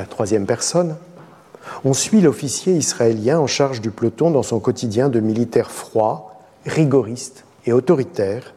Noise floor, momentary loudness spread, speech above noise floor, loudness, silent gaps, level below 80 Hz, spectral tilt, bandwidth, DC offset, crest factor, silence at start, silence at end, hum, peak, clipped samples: -43 dBFS; 10 LU; 25 dB; -18 LUFS; none; -60 dBFS; -5.5 dB/octave; 14.5 kHz; under 0.1%; 16 dB; 0 s; 0.05 s; none; -4 dBFS; under 0.1%